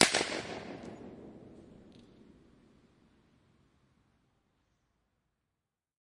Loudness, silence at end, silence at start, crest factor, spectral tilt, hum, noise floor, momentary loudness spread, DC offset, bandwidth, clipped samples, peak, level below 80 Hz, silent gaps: -35 LUFS; 4.15 s; 0 s; 34 dB; -2 dB/octave; none; -88 dBFS; 26 LU; under 0.1%; 11.5 kHz; under 0.1%; -6 dBFS; -70 dBFS; none